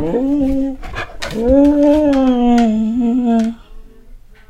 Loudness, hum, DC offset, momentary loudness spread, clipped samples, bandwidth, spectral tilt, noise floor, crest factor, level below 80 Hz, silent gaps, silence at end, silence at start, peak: -14 LUFS; none; under 0.1%; 12 LU; under 0.1%; 10.5 kHz; -7 dB/octave; -38 dBFS; 14 dB; -30 dBFS; none; 0.3 s; 0 s; 0 dBFS